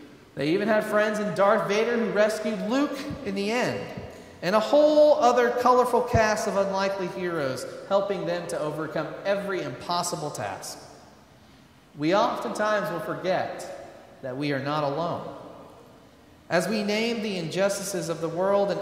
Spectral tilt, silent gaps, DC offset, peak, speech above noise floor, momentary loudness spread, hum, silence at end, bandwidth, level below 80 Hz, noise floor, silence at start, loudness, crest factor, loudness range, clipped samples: -5 dB/octave; none; under 0.1%; -8 dBFS; 29 dB; 14 LU; none; 0 s; 16 kHz; -56 dBFS; -53 dBFS; 0 s; -25 LUFS; 18 dB; 9 LU; under 0.1%